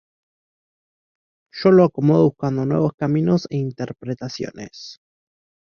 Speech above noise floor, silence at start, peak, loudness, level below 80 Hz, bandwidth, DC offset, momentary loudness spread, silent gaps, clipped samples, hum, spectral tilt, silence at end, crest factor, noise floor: over 71 dB; 1.55 s; -2 dBFS; -19 LUFS; -58 dBFS; 7 kHz; under 0.1%; 21 LU; 2.94-2.98 s; under 0.1%; none; -8 dB/octave; 0.85 s; 18 dB; under -90 dBFS